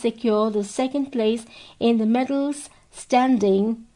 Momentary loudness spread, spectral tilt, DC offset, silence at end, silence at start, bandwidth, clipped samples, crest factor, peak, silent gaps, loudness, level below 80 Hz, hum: 10 LU; -5.5 dB/octave; under 0.1%; 0.15 s; 0 s; 11 kHz; under 0.1%; 14 dB; -8 dBFS; none; -22 LUFS; -62 dBFS; none